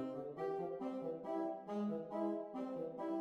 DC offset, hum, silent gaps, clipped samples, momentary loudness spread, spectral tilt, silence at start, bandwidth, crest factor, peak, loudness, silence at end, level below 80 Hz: under 0.1%; none; none; under 0.1%; 3 LU; -8.5 dB/octave; 0 s; 8.4 kHz; 14 dB; -28 dBFS; -43 LUFS; 0 s; -84 dBFS